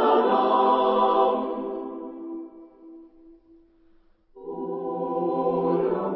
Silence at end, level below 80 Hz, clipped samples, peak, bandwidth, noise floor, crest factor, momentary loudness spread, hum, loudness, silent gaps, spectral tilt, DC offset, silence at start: 0 s; -66 dBFS; under 0.1%; -8 dBFS; 5.8 kHz; -58 dBFS; 16 dB; 17 LU; none; -23 LUFS; none; -10.5 dB/octave; under 0.1%; 0 s